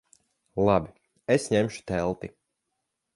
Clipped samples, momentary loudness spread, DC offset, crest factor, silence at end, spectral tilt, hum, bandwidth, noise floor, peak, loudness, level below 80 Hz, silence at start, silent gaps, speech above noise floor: under 0.1%; 16 LU; under 0.1%; 22 dB; 0.85 s; -6 dB/octave; none; 11.5 kHz; -81 dBFS; -8 dBFS; -27 LUFS; -52 dBFS; 0.55 s; none; 56 dB